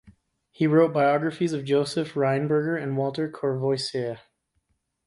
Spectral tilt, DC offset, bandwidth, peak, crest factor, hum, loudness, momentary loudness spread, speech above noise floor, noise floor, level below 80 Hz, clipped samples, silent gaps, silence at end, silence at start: -6.5 dB/octave; under 0.1%; 11.5 kHz; -8 dBFS; 18 dB; none; -25 LUFS; 8 LU; 50 dB; -73 dBFS; -66 dBFS; under 0.1%; none; 0.9 s; 0.05 s